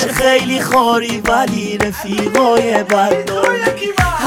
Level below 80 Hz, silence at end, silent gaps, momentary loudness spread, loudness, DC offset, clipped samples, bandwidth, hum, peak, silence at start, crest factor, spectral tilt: -34 dBFS; 0 s; none; 6 LU; -14 LUFS; under 0.1%; under 0.1%; 18.5 kHz; none; 0 dBFS; 0 s; 14 dB; -4 dB/octave